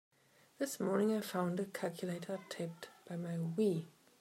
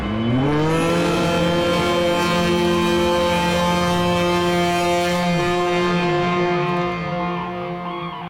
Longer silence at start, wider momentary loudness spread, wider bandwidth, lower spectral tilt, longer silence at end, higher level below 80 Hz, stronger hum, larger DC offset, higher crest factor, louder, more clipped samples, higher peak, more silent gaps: first, 0.6 s vs 0 s; first, 11 LU vs 6 LU; about the same, 16 kHz vs 17 kHz; about the same, -6 dB/octave vs -5.5 dB/octave; first, 0.3 s vs 0 s; second, -88 dBFS vs -42 dBFS; neither; neither; first, 18 dB vs 10 dB; second, -39 LUFS vs -19 LUFS; neither; second, -20 dBFS vs -8 dBFS; neither